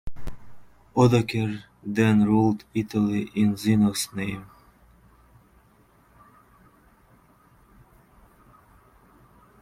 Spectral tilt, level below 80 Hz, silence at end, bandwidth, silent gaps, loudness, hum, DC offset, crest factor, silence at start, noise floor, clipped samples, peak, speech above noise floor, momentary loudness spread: -6.5 dB/octave; -50 dBFS; 5.15 s; 15 kHz; none; -23 LUFS; none; under 0.1%; 20 dB; 0.05 s; -59 dBFS; under 0.1%; -6 dBFS; 36 dB; 17 LU